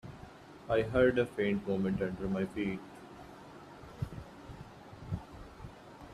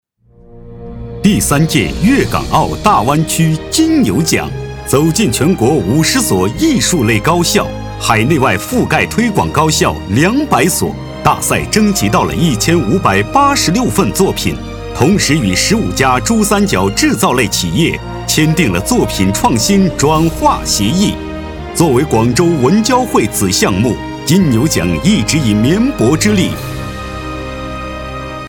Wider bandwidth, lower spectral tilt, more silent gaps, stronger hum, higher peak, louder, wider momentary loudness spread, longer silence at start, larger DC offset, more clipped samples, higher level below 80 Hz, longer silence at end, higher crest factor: second, 13 kHz vs 19.5 kHz; first, -7.5 dB/octave vs -4.5 dB/octave; neither; neither; second, -16 dBFS vs 0 dBFS; second, -34 LUFS vs -12 LUFS; first, 23 LU vs 11 LU; second, 0.05 s vs 0.55 s; neither; neither; second, -56 dBFS vs -30 dBFS; about the same, 0 s vs 0 s; first, 20 dB vs 12 dB